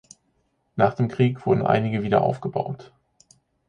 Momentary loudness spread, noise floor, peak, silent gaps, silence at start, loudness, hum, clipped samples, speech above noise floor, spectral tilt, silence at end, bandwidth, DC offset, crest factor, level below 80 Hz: 11 LU; -69 dBFS; -4 dBFS; none; 0.75 s; -23 LUFS; none; under 0.1%; 47 dB; -8 dB/octave; 0.85 s; 9.6 kHz; under 0.1%; 20 dB; -56 dBFS